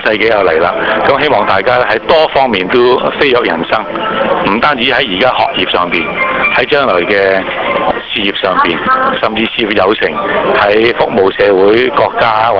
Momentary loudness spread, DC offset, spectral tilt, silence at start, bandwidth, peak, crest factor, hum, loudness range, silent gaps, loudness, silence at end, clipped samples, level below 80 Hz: 4 LU; 0.3%; -6.5 dB/octave; 0 s; 5.4 kHz; 0 dBFS; 10 dB; none; 1 LU; none; -10 LUFS; 0 s; under 0.1%; -40 dBFS